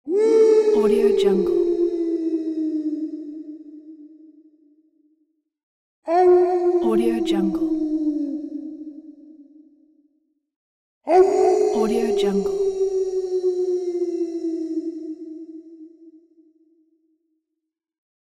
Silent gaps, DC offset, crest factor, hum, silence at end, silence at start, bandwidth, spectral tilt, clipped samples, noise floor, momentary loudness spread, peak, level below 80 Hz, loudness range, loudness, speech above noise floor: 5.63-6.03 s, 10.56-11.01 s; under 0.1%; 16 dB; none; 2.4 s; 0.05 s; 12 kHz; -6.5 dB/octave; under 0.1%; -82 dBFS; 21 LU; -6 dBFS; -56 dBFS; 12 LU; -20 LUFS; 64 dB